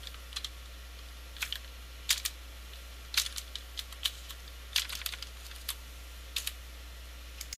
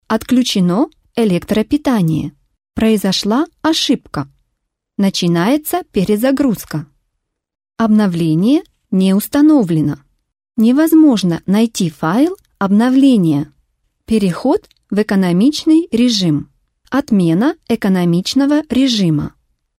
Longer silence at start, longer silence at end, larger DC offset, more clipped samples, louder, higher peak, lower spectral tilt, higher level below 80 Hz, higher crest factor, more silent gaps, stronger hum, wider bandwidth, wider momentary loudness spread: about the same, 0 s vs 0.1 s; second, 0 s vs 0.5 s; neither; neither; second, -37 LUFS vs -14 LUFS; second, -10 dBFS vs -2 dBFS; second, 0 dB/octave vs -6 dB/octave; about the same, -48 dBFS vs -46 dBFS; first, 30 dB vs 12 dB; neither; neither; about the same, 16 kHz vs 16 kHz; first, 16 LU vs 9 LU